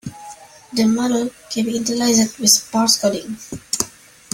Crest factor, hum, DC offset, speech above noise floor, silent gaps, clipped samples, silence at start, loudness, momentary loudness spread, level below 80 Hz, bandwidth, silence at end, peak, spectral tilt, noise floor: 20 dB; none; under 0.1%; 22 dB; none; under 0.1%; 0.05 s; -17 LUFS; 17 LU; -56 dBFS; 16.5 kHz; 0.45 s; 0 dBFS; -2.5 dB/octave; -40 dBFS